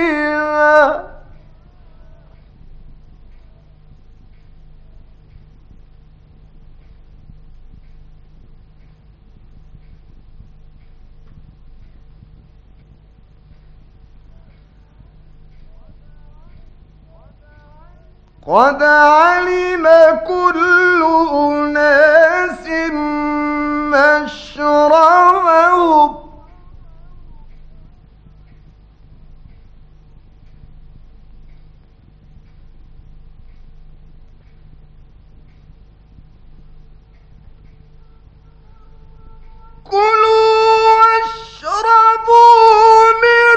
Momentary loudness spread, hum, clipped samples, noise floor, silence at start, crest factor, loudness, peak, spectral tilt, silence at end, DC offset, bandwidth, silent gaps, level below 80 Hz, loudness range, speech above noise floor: 11 LU; none; 0.1%; -45 dBFS; 0 s; 16 dB; -11 LUFS; 0 dBFS; -4.5 dB/octave; 0 s; under 0.1%; 8.8 kHz; none; -42 dBFS; 9 LU; 34 dB